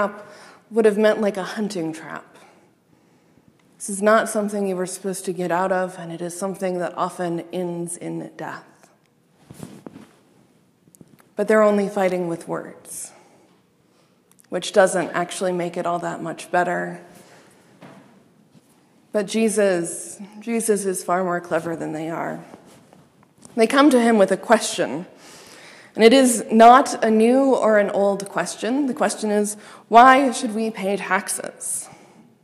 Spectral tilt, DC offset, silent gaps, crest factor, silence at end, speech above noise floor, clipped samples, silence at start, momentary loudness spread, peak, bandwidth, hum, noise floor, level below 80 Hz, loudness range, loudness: -4 dB/octave; under 0.1%; none; 22 dB; 0.5 s; 40 dB; under 0.1%; 0 s; 18 LU; 0 dBFS; 15 kHz; none; -59 dBFS; -68 dBFS; 12 LU; -20 LUFS